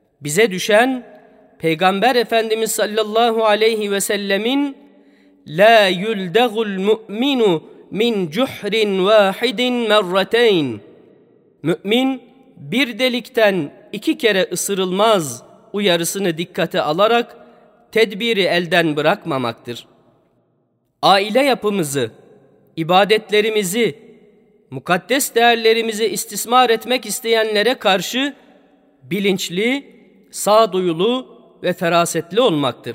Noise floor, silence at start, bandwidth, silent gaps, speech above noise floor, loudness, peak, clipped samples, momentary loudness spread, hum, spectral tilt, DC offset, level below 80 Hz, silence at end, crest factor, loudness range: -65 dBFS; 0.2 s; 16 kHz; none; 48 dB; -17 LUFS; 0 dBFS; under 0.1%; 10 LU; none; -3.5 dB/octave; under 0.1%; -68 dBFS; 0 s; 18 dB; 3 LU